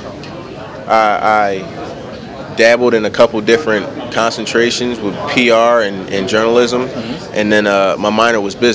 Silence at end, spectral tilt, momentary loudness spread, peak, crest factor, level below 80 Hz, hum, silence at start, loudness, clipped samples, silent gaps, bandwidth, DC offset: 0 s; -4 dB/octave; 17 LU; 0 dBFS; 14 dB; -46 dBFS; none; 0 s; -13 LUFS; 0.4%; none; 8 kHz; under 0.1%